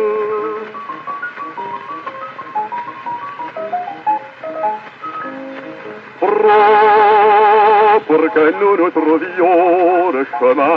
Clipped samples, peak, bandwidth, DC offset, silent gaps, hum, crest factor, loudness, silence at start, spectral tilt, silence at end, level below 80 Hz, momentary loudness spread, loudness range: under 0.1%; -2 dBFS; 5.6 kHz; under 0.1%; none; none; 12 dB; -13 LUFS; 0 s; -2.5 dB/octave; 0 s; -74 dBFS; 18 LU; 13 LU